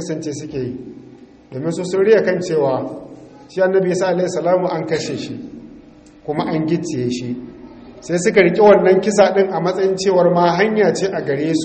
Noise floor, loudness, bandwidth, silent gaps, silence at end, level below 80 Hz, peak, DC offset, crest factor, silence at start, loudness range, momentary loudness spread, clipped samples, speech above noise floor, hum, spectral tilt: -43 dBFS; -16 LUFS; 8.8 kHz; none; 0 s; -54 dBFS; 0 dBFS; under 0.1%; 18 dB; 0 s; 8 LU; 17 LU; under 0.1%; 27 dB; none; -5.5 dB/octave